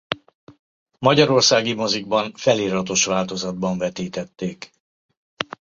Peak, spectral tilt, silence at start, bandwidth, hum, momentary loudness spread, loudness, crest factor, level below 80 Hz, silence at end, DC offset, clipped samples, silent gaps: -2 dBFS; -3.5 dB/octave; 0.1 s; 7.8 kHz; none; 15 LU; -20 LUFS; 20 dB; -58 dBFS; 0.35 s; under 0.1%; under 0.1%; 0.35-0.47 s, 0.59-0.86 s, 4.80-5.09 s, 5.17-5.37 s